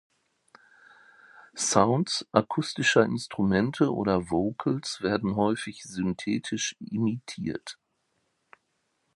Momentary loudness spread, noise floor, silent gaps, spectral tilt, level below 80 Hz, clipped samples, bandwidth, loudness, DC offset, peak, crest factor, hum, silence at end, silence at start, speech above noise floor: 11 LU; -75 dBFS; none; -4.5 dB/octave; -58 dBFS; under 0.1%; 11.5 kHz; -27 LUFS; under 0.1%; -4 dBFS; 24 dB; none; 1.45 s; 1.35 s; 49 dB